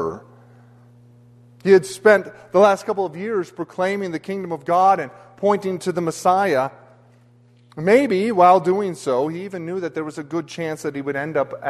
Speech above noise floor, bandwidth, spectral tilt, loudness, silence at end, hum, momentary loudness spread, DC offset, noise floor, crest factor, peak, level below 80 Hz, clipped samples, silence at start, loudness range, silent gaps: 33 dB; 13 kHz; -6 dB/octave; -20 LUFS; 0 s; none; 13 LU; under 0.1%; -52 dBFS; 18 dB; -2 dBFS; -64 dBFS; under 0.1%; 0 s; 3 LU; none